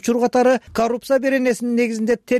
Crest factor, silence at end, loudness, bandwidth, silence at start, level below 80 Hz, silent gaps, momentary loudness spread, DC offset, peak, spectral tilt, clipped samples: 10 dB; 0 s; -19 LUFS; 15 kHz; 0.05 s; -54 dBFS; none; 5 LU; under 0.1%; -8 dBFS; -4.5 dB/octave; under 0.1%